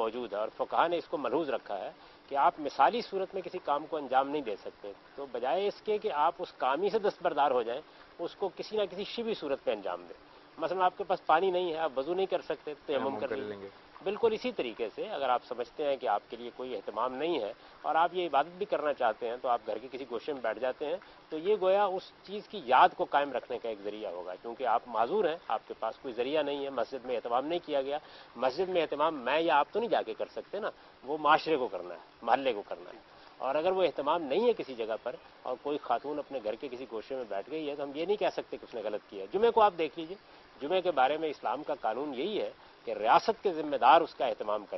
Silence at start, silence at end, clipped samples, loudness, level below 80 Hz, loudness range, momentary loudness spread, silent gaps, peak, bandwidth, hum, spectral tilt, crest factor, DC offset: 0 s; 0 s; under 0.1%; -32 LUFS; -72 dBFS; 4 LU; 13 LU; none; -8 dBFS; 6 kHz; none; -6 dB/octave; 24 dB; under 0.1%